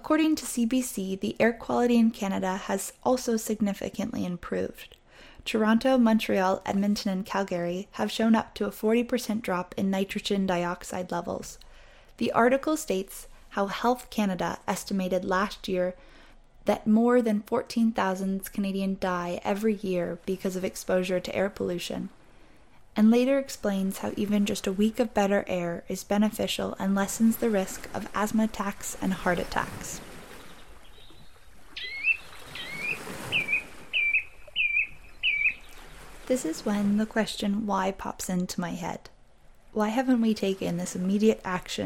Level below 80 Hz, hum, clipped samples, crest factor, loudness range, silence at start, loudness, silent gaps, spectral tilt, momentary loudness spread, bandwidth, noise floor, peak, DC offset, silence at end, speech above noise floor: -52 dBFS; none; under 0.1%; 20 dB; 4 LU; 0 s; -27 LUFS; none; -5 dB/octave; 11 LU; 16.5 kHz; -56 dBFS; -8 dBFS; under 0.1%; 0 s; 29 dB